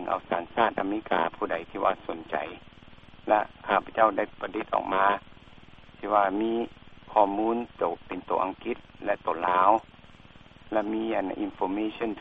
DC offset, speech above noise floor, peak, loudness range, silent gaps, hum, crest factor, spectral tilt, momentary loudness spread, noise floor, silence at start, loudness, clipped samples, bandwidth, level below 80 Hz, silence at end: under 0.1%; 24 dB; -6 dBFS; 2 LU; none; none; 22 dB; -7.5 dB/octave; 10 LU; -51 dBFS; 0 s; -28 LUFS; under 0.1%; 4.9 kHz; -58 dBFS; 0 s